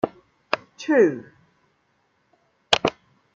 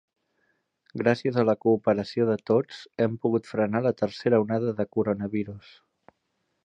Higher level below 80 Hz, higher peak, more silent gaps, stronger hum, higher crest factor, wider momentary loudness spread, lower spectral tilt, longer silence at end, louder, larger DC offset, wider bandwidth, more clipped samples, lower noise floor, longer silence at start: about the same, -62 dBFS vs -64 dBFS; first, 0 dBFS vs -6 dBFS; neither; neither; first, 26 dB vs 20 dB; first, 11 LU vs 8 LU; second, -4 dB/octave vs -8 dB/octave; second, 0.45 s vs 1.05 s; first, -22 LUFS vs -26 LUFS; neither; first, 9.4 kHz vs 8.4 kHz; neither; second, -68 dBFS vs -76 dBFS; second, 0.05 s vs 0.95 s